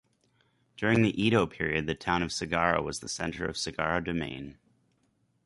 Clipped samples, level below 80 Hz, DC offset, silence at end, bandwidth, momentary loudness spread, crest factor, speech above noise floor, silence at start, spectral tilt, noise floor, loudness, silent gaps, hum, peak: under 0.1%; -52 dBFS; under 0.1%; 0.95 s; 11.5 kHz; 9 LU; 22 dB; 43 dB; 0.8 s; -5 dB/octave; -72 dBFS; -29 LUFS; none; none; -8 dBFS